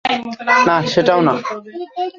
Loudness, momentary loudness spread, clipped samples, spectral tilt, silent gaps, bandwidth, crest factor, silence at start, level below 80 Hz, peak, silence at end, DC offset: -15 LUFS; 14 LU; under 0.1%; -5 dB/octave; none; 7.6 kHz; 14 dB; 0.05 s; -56 dBFS; -2 dBFS; 0.05 s; under 0.1%